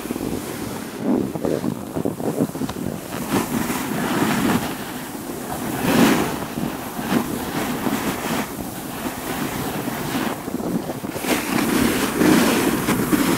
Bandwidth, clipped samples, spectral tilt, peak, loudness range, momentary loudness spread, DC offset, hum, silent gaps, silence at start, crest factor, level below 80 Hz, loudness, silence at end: 16 kHz; under 0.1%; -4.5 dB/octave; -4 dBFS; 5 LU; 11 LU; under 0.1%; none; none; 0 s; 18 dB; -46 dBFS; -22 LUFS; 0 s